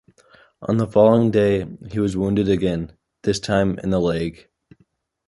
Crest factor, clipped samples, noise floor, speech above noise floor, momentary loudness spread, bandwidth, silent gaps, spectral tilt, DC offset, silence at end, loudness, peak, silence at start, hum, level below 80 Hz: 18 dB; under 0.1%; -63 dBFS; 44 dB; 14 LU; 11.5 kHz; none; -7 dB/octave; under 0.1%; 0.95 s; -20 LUFS; -2 dBFS; 0.6 s; none; -44 dBFS